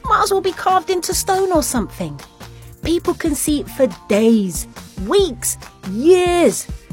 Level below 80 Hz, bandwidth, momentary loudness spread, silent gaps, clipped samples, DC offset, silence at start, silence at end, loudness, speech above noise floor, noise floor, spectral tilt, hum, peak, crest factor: -36 dBFS; 16.5 kHz; 14 LU; none; under 0.1%; under 0.1%; 0.05 s; 0.15 s; -17 LUFS; 20 dB; -37 dBFS; -4 dB/octave; none; 0 dBFS; 16 dB